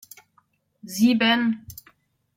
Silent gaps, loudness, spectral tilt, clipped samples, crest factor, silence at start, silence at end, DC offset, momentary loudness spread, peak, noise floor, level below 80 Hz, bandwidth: none; -21 LUFS; -4 dB/octave; under 0.1%; 18 dB; 0.85 s; 0.65 s; under 0.1%; 24 LU; -8 dBFS; -65 dBFS; -64 dBFS; 16.5 kHz